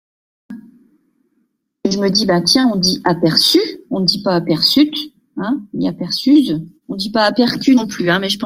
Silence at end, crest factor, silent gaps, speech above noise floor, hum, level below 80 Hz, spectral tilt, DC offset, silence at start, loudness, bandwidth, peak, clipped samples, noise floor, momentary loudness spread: 0 s; 16 dB; none; 51 dB; none; -54 dBFS; -4.5 dB/octave; under 0.1%; 0.5 s; -15 LUFS; 16 kHz; 0 dBFS; under 0.1%; -66 dBFS; 11 LU